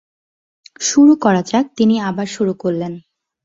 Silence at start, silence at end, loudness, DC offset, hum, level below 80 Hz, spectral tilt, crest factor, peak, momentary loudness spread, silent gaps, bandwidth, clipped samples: 0.8 s; 0.45 s; -15 LUFS; under 0.1%; none; -58 dBFS; -5 dB/octave; 14 dB; -2 dBFS; 12 LU; none; 7.8 kHz; under 0.1%